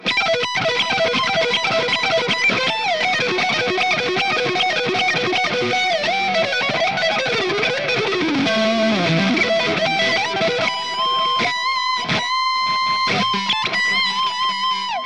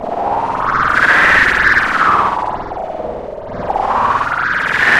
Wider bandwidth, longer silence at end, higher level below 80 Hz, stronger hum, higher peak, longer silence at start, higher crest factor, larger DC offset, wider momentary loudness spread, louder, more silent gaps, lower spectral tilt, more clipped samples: second, 11.5 kHz vs 15.5 kHz; about the same, 0 s vs 0 s; second, -62 dBFS vs -36 dBFS; neither; second, -6 dBFS vs 0 dBFS; about the same, 0 s vs 0 s; about the same, 12 dB vs 14 dB; first, 0.4% vs under 0.1%; second, 2 LU vs 15 LU; second, -18 LUFS vs -13 LUFS; neither; about the same, -3.5 dB/octave vs -4 dB/octave; neither